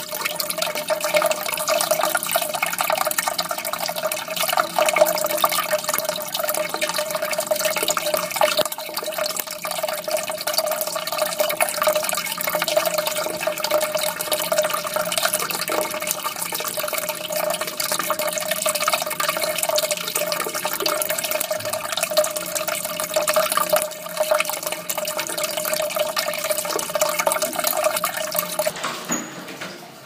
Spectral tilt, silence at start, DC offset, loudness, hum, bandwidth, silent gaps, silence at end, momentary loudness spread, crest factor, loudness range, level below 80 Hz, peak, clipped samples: -1 dB/octave; 0 s; under 0.1%; -22 LUFS; none; 16.5 kHz; none; 0 s; 5 LU; 24 dB; 2 LU; -66 dBFS; 0 dBFS; under 0.1%